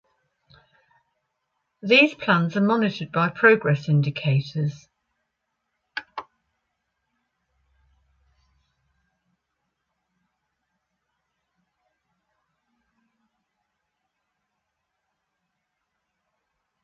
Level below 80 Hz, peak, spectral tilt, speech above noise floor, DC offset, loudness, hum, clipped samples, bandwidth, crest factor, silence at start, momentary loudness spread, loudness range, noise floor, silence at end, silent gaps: -70 dBFS; -4 dBFS; -7 dB/octave; 58 dB; under 0.1%; -21 LUFS; none; under 0.1%; 7 kHz; 24 dB; 1.85 s; 19 LU; 23 LU; -79 dBFS; 10.6 s; none